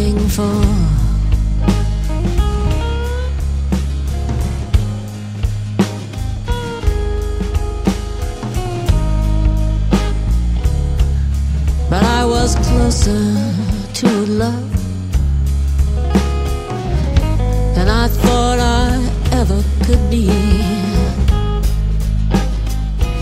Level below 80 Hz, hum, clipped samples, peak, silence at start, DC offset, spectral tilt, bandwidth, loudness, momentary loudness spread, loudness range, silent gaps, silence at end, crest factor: -16 dBFS; none; under 0.1%; 0 dBFS; 0 s; under 0.1%; -6 dB/octave; 15.5 kHz; -17 LUFS; 7 LU; 5 LU; none; 0 s; 14 dB